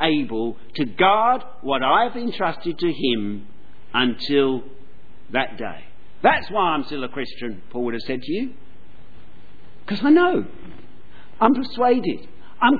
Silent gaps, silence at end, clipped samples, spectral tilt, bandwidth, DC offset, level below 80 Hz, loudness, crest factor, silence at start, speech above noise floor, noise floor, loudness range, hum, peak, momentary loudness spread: none; 0 s; under 0.1%; -7.5 dB/octave; 4.9 kHz; 4%; -54 dBFS; -21 LUFS; 20 dB; 0 s; 29 dB; -50 dBFS; 4 LU; none; -2 dBFS; 14 LU